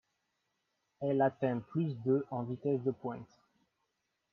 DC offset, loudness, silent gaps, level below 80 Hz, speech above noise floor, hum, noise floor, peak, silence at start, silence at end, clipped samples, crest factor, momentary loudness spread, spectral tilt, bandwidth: under 0.1%; -35 LUFS; none; -78 dBFS; 49 dB; none; -83 dBFS; -18 dBFS; 1 s; 1.1 s; under 0.1%; 18 dB; 10 LU; -10.5 dB/octave; 6 kHz